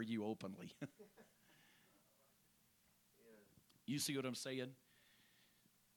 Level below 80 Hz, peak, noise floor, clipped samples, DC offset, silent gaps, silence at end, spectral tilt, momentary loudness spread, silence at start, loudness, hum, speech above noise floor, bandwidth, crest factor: -90 dBFS; -30 dBFS; -76 dBFS; under 0.1%; under 0.1%; none; 1.2 s; -4 dB/octave; 24 LU; 0 s; -47 LUFS; none; 30 dB; 19 kHz; 20 dB